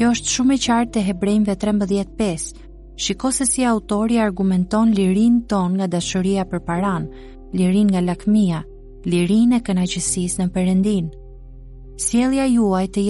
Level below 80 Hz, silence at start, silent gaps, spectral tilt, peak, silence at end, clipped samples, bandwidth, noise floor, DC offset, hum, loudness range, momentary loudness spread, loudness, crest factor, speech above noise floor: -40 dBFS; 0 s; none; -5 dB/octave; -6 dBFS; 0 s; under 0.1%; 11.5 kHz; -38 dBFS; under 0.1%; none; 2 LU; 7 LU; -19 LUFS; 12 dB; 20 dB